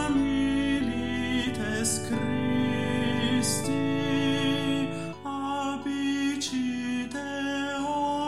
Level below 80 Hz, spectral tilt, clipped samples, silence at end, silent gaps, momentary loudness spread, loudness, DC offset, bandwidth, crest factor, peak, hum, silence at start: -50 dBFS; -4.5 dB/octave; under 0.1%; 0 s; none; 6 LU; -28 LUFS; 0.6%; 14 kHz; 14 dB; -14 dBFS; none; 0 s